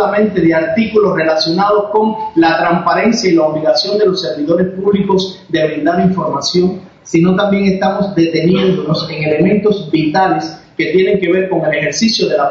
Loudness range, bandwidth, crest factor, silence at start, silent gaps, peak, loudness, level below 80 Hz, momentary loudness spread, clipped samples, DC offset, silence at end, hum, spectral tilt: 2 LU; 7.8 kHz; 10 dB; 0 s; none; -2 dBFS; -13 LUFS; -48 dBFS; 4 LU; under 0.1%; under 0.1%; 0 s; none; -5.5 dB/octave